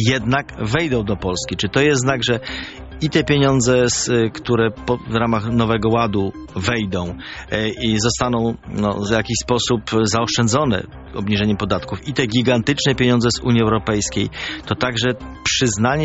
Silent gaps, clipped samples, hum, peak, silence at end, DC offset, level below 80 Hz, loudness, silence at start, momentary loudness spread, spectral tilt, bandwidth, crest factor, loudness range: none; under 0.1%; none; -2 dBFS; 0 s; under 0.1%; -38 dBFS; -19 LUFS; 0 s; 8 LU; -4.5 dB/octave; 8.2 kHz; 18 dB; 3 LU